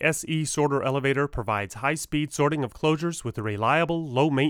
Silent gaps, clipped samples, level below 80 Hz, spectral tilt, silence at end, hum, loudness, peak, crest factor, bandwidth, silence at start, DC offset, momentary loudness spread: none; under 0.1%; -48 dBFS; -5 dB/octave; 0 s; none; -25 LUFS; -8 dBFS; 18 dB; 17.5 kHz; 0 s; under 0.1%; 5 LU